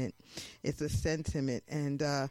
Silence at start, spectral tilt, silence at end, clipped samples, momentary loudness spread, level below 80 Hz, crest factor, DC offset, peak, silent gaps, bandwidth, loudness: 0 s; -5.5 dB/octave; 0 s; under 0.1%; 8 LU; -50 dBFS; 16 dB; under 0.1%; -18 dBFS; none; 16 kHz; -35 LUFS